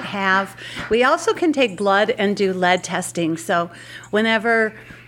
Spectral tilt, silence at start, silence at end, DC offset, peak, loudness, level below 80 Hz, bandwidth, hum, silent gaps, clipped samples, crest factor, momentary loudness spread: -4 dB/octave; 0 s; 0.05 s; under 0.1%; -2 dBFS; -19 LUFS; -54 dBFS; 16.5 kHz; none; none; under 0.1%; 18 dB; 7 LU